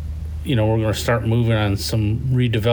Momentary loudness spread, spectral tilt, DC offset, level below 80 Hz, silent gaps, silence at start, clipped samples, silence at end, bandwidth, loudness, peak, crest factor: 4 LU; -6.5 dB/octave; under 0.1%; -32 dBFS; none; 0 s; under 0.1%; 0 s; over 20 kHz; -20 LUFS; -6 dBFS; 12 dB